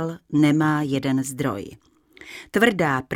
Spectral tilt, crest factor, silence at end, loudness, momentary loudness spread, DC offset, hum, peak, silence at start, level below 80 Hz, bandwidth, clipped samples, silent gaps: -6 dB/octave; 20 dB; 0 s; -21 LUFS; 18 LU; under 0.1%; none; -4 dBFS; 0 s; -56 dBFS; 17 kHz; under 0.1%; none